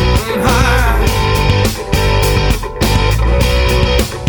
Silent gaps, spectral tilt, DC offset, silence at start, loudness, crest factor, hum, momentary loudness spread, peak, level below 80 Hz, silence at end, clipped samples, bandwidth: none; -5 dB/octave; under 0.1%; 0 s; -13 LUFS; 12 dB; none; 3 LU; 0 dBFS; -16 dBFS; 0 s; under 0.1%; over 20 kHz